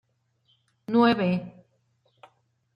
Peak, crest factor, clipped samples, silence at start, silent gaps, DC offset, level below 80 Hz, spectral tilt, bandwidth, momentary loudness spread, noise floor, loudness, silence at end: -8 dBFS; 20 dB; under 0.1%; 0.9 s; none; under 0.1%; -70 dBFS; -8.5 dB/octave; 5.4 kHz; 24 LU; -69 dBFS; -24 LUFS; 1.25 s